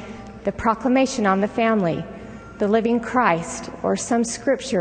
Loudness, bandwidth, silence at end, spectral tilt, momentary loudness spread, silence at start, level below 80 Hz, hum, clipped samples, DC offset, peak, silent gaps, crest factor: -21 LUFS; 9.4 kHz; 0 s; -5 dB/octave; 11 LU; 0 s; -48 dBFS; none; under 0.1%; under 0.1%; -4 dBFS; none; 18 dB